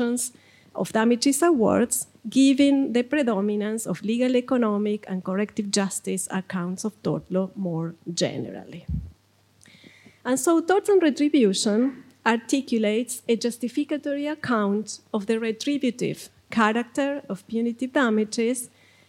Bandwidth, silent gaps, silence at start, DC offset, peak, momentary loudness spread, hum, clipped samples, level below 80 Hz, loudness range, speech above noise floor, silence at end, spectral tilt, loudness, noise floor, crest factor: 16 kHz; none; 0 s; under 0.1%; -4 dBFS; 11 LU; none; under 0.1%; -54 dBFS; 7 LU; 37 dB; 0.45 s; -4.5 dB/octave; -24 LUFS; -61 dBFS; 20 dB